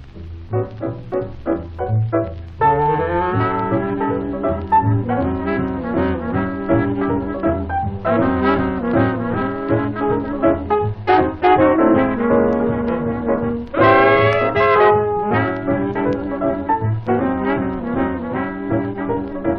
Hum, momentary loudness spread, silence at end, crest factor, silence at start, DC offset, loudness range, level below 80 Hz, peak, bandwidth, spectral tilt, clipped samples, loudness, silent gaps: none; 10 LU; 0 s; 16 dB; 0 s; under 0.1%; 5 LU; -38 dBFS; -2 dBFS; 5.6 kHz; -10 dB/octave; under 0.1%; -18 LUFS; none